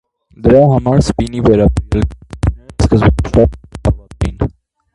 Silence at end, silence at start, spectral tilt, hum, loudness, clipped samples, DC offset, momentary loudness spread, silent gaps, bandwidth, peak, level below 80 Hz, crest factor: 0.45 s; 0.4 s; -8 dB/octave; none; -13 LUFS; under 0.1%; under 0.1%; 10 LU; none; 11.5 kHz; 0 dBFS; -22 dBFS; 12 dB